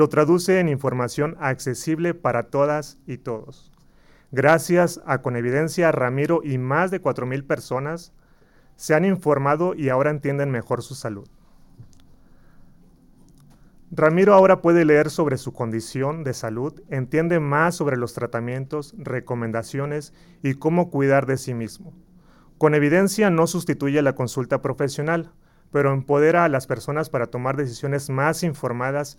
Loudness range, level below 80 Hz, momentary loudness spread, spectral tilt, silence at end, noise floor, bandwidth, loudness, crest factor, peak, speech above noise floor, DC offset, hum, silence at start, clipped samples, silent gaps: 6 LU; -54 dBFS; 12 LU; -6.5 dB/octave; 0.05 s; -54 dBFS; 17 kHz; -21 LUFS; 18 dB; -4 dBFS; 33 dB; under 0.1%; none; 0 s; under 0.1%; none